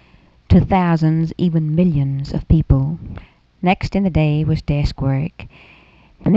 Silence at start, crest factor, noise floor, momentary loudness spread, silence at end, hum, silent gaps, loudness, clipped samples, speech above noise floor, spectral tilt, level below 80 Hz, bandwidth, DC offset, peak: 0.5 s; 16 dB; -50 dBFS; 9 LU; 0 s; none; none; -18 LUFS; under 0.1%; 34 dB; -9 dB/octave; -30 dBFS; 7.4 kHz; under 0.1%; 0 dBFS